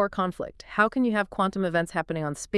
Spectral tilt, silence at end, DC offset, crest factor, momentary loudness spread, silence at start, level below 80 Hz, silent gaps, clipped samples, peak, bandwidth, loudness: -5.5 dB/octave; 0 s; under 0.1%; 18 dB; 8 LU; 0 s; -54 dBFS; none; under 0.1%; -8 dBFS; 12 kHz; -26 LUFS